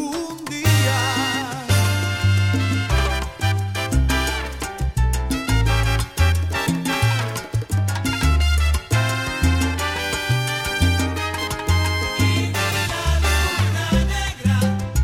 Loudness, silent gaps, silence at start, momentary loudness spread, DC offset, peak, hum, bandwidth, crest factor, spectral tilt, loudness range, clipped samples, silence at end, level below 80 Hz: -20 LUFS; none; 0 s; 5 LU; under 0.1%; -4 dBFS; none; 17 kHz; 14 dB; -4.5 dB/octave; 1 LU; under 0.1%; 0 s; -26 dBFS